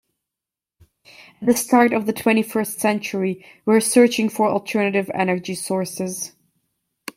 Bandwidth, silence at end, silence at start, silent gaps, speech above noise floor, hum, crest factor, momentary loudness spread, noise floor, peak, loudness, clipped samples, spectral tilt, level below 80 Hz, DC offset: 16.5 kHz; 0.9 s; 1.2 s; none; 68 dB; none; 18 dB; 11 LU; -87 dBFS; -2 dBFS; -20 LUFS; under 0.1%; -4.5 dB/octave; -64 dBFS; under 0.1%